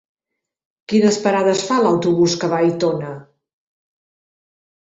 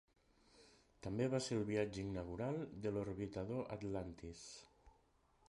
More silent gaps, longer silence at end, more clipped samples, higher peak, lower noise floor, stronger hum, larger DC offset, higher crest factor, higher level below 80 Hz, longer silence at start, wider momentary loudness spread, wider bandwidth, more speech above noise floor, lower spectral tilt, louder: neither; first, 1.65 s vs 0.6 s; neither; first, -4 dBFS vs -26 dBFS; first, -81 dBFS vs -75 dBFS; neither; neither; about the same, 16 dB vs 20 dB; about the same, -60 dBFS vs -64 dBFS; first, 0.9 s vs 0.55 s; second, 8 LU vs 14 LU; second, 8.2 kHz vs 11 kHz; first, 65 dB vs 32 dB; about the same, -5 dB/octave vs -6 dB/octave; first, -17 LUFS vs -44 LUFS